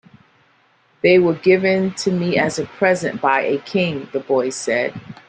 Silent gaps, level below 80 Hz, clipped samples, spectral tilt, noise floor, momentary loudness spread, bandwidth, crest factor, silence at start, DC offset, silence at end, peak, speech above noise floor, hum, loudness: none; -60 dBFS; under 0.1%; -5.5 dB/octave; -57 dBFS; 7 LU; 9.6 kHz; 18 dB; 1.05 s; under 0.1%; 0.15 s; -2 dBFS; 40 dB; none; -18 LUFS